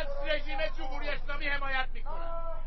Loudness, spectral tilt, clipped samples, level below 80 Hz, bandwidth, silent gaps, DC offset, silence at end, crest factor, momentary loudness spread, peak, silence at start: -35 LUFS; -1.5 dB/octave; under 0.1%; -32 dBFS; 5.8 kHz; none; under 0.1%; 0 s; 14 dB; 8 LU; -16 dBFS; 0 s